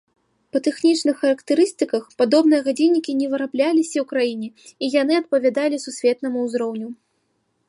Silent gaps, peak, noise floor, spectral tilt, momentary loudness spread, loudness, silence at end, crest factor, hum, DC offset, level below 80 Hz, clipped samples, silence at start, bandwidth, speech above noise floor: none; -6 dBFS; -69 dBFS; -4 dB/octave; 8 LU; -20 LUFS; 0.75 s; 16 dB; none; under 0.1%; -76 dBFS; under 0.1%; 0.55 s; 11.5 kHz; 50 dB